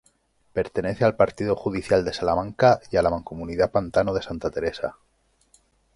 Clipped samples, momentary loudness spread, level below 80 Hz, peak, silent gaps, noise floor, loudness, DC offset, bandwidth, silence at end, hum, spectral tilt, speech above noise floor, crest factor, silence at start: under 0.1%; 10 LU; -46 dBFS; -4 dBFS; none; -64 dBFS; -24 LUFS; under 0.1%; 11.5 kHz; 1.05 s; none; -6.5 dB/octave; 41 dB; 20 dB; 0.55 s